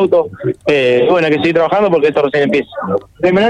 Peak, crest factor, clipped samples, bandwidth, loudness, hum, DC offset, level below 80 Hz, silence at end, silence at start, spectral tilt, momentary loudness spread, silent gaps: -2 dBFS; 10 dB; under 0.1%; 9.6 kHz; -13 LUFS; none; under 0.1%; -50 dBFS; 0 s; 0 s; -7 dB/octave; 8 LU; none